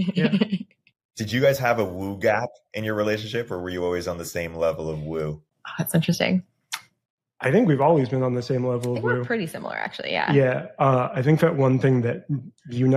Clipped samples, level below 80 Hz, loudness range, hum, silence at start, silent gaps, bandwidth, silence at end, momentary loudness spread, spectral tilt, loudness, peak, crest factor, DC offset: under 0.1%; -56 dBFS; 5 LU; none; 0 s; 1.05-1.09 s, 7.10-7.18 s; 15.5 kHz; 0 s; 12 LU; -6.5 dB/octave; -23 LUFS; -6 dBFS; 18 dB; under 0.1%